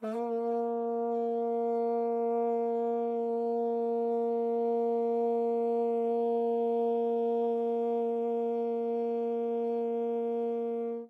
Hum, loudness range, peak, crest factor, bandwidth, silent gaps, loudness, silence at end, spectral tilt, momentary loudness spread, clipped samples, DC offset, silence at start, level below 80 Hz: none; 2 LU; -20 dBFS; 10 dB; 4.4 kHz; none; -31 LUFS; 0 s; -8.5 dB/octave; 2 LU; under 0.1%; under 0.1%; 0 s; under -90 dBFS